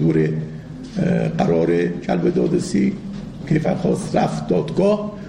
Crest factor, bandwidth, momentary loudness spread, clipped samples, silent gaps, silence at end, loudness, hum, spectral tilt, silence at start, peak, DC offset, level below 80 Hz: 14 dB; 11 kHz; 12 LU; under 0.1%; none; 0 s; -20 LUFS; none; -7.5 dB/octave; 0 s; -4 dBFS; 0.1%; -44 dBFS